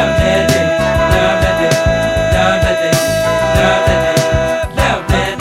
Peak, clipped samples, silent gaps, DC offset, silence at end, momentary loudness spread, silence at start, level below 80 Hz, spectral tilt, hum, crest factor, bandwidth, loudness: 0 dBFS; under 0.1%; none; under 0.1%; 0 s; 3 LU; 0 s; -24 dBFS; -5 dB/octave; none; 12 dB; 16.5 kHz; -12 LUFS